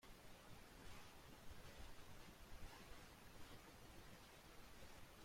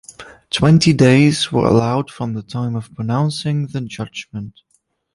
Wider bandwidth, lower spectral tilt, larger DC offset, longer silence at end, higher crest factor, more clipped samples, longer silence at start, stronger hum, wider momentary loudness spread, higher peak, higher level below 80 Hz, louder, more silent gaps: first, 16.5 kHz vs 11.5 kHz; second, -3.5 dB/octave vs -6 dB/octave; neither; second, 0 s vs 0.65 s; about the same, 16 dB vs 16 dB; neither; second, 0 s vs 0.2 s; neither; second, 2 LU vs 17 LU; second, -44 dBFS vs -2 dBFS; second, -66 dBFS vs -46 dBFS; second, -62 LUFS vs -16 LUFS; neither